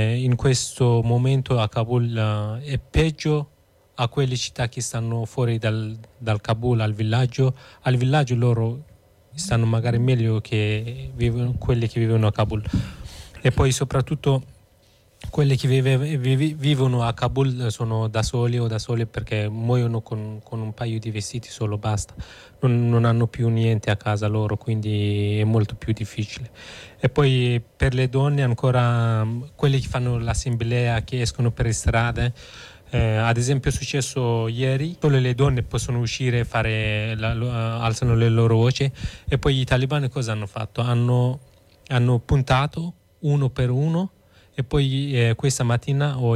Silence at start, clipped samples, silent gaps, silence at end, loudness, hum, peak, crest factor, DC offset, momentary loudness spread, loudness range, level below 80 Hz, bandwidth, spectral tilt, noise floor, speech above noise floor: 0 s; under 0.1%; none; 0 s; -22 LUFS; none; -8 dBFS; 12 dB; under 0.1%; 9 LU; 3 LU; -38 dBFS; 12 kHz; -6 dB/octave; -57 dBFS; 35 dB